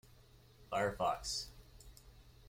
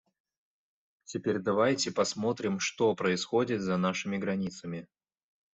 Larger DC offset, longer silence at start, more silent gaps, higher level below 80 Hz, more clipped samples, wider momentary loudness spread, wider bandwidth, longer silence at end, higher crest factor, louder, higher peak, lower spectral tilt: neither; second, 0.05 s vs 1.1 s; neither; first, -60 dBFS vs -70 dBFS; neither; first, 23 LU vs 10 LU; first, 16.5 kHz vs 8.2 kHz; second, 0.2 s vs 0.7 s; about the same, 20 dB vs 18 dB; second, -39 LUFS vs -30 LUFS; second, -24 dBFS vs -14 dBFS; second, -3 dB/octave vs -4.5 dB/octave